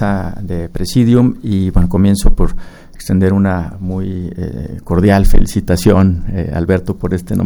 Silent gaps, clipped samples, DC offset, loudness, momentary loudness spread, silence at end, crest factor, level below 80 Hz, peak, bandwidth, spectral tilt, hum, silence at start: none; 0.2%; under 0.1%; -14 LUFS; 11 LU; 0 s; 12 dB; -18 dBFS; 0 dBFS; over 20 kHz; -7.5 dB/octave; none; 0 s